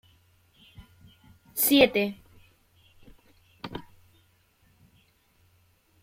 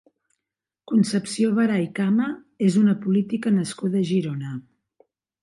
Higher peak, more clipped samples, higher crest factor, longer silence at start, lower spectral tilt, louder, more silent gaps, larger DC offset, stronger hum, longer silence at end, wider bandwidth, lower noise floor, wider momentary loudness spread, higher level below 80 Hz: first, -4 dBFS vs -8 dBFS; neither; first, 26 dB vs 14 dB; first, 1.55 s vs 0.9 s; second, -3 dB/octave vs -6.5 dB/octave; about the same, -23 LUFS vs -22 LUFS; neither; neither; neither; first, 2.2 s vs 0.8 s; first, 16.5 kHz vs 11.5 kHz; second, -65 dBFS vs -86 dBFS; first, 24 LU vs 9 LU; first, -62 dBFS vs -70 dBFS